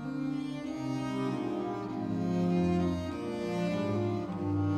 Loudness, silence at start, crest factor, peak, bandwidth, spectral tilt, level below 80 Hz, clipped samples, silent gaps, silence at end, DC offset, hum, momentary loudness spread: -33 LUFS; 0 s; 12 dB; -18 dBFS; 10 kHz; -8 dB/octave; -58 dBFS; under 0.1%; none; 0 s; under 0.1%; none; 7 LU